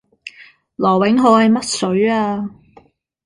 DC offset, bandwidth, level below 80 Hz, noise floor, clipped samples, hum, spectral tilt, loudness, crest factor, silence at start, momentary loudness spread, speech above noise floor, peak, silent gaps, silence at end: under 0.1%; 11.5 kHz; -56 dBFS; -50 dBFS; under 0.1%; none; -5 dB/octave; -15 LUFS; 16 dB; 0.25 s; 22 LU; 36 dB; -2 dBFS; none; 0.75 s